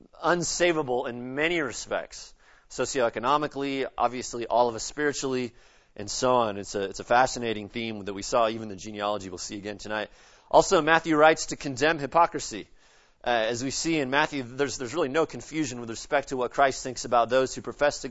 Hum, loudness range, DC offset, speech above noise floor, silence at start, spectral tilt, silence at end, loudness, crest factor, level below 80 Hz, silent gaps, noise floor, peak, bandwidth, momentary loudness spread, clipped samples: none; 5 LU; under 0.1%; 32 dB; 0.2 s; -3.5 dB/octave; 0 s; -26 LUFS; 22 dB; -54 dBFS; none; -58 dBFS; -4 dBFS; 8.2 kHz; 12 LU; under 0.1%